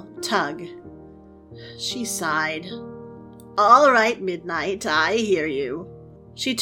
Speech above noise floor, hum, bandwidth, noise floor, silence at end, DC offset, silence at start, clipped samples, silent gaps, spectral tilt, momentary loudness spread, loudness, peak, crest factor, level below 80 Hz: 24 dB; none; 17.5 kHz; -45 dBFS; 0 s; under 0.1%; 0 s; under 0.1%; none; -3 dB/octave; 25 LU; -21 LUFS; -2 dBFS; 22 dB; -58 dBFS